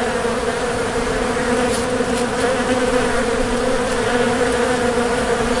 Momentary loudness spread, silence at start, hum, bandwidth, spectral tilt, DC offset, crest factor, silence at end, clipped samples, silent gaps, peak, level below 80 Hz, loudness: 3 LU; 0 s; none; 11.5 kHz; -4 dB/octave; 0.4%; 14 dB; 0 s; under 0.1%; none; -4 dBFS; -34 dBFS; -18 LUFS